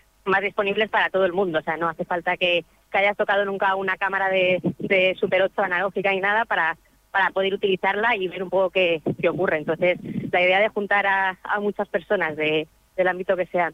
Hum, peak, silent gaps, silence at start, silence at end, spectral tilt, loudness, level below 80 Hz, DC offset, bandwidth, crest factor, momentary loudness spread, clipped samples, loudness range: none; -8 dBFS; none; 0.25 s; 0 s; -6.5 dB/octave; -22 LUFS; -60 dBFS; under 0.1%; 8.6 kHz; 14 dB; 5 LU; under 0.1%; 1 LU